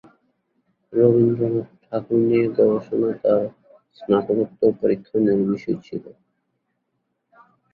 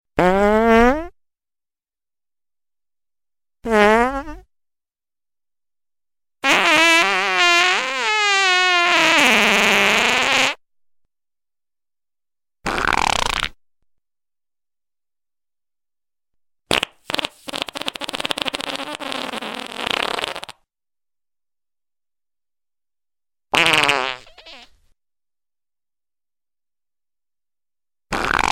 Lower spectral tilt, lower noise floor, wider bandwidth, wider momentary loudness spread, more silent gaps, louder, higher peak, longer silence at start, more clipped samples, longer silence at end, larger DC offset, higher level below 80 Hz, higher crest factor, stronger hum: first, -10.5 dB/octave vs -2 dB/octave; second, -74 dBFS vs under -90 dBFS; second, 4.8 kHz vs 17 kHz; second, 12 LU vs 15 LU; neither; second, -21 LUFS vs -16 LUFS; about the same, -4 dBFS vs -2 dBFS; first, 0.9 s vs 0.15 s; neither; first, 1.6 s vs 0 s; neither; second, -60 dBFS vs -44 dBFS; about the same, 18 dB vs 20 dB; neither